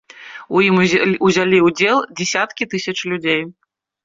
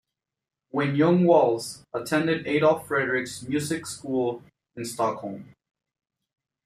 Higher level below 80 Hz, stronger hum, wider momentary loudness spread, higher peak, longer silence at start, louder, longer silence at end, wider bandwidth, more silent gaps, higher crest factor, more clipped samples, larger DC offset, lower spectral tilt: first, -56 dBFS vs -66 dBFS; neither; second, 9 LU vs 15 LU; first, -2 dBFS vs -8 dBFS; second, 0.2 s vs 0.75 s; first, -16 LUFS vs -25 LUFS; second, 0.55 s vs 1.2 s; second, 7.6 kHz vs 15 kHz; neither; about the same, 14 dB vs 18 dB; neither; neither; about the same, -4.5 dB/octave vs -5.5 dB/octave